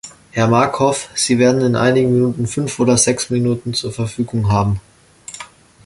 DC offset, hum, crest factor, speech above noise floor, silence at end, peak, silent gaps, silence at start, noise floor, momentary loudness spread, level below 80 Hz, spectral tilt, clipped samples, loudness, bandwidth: under 0.1%; none; 16 dB; 23 dB; 0.4 s; 0 dBFS; none; 0.05 s; -38 dBFS; 13 LU; -42 dBFS; -5 dB/octave; under 0.1%; -16 LUFS; 11.5 kHz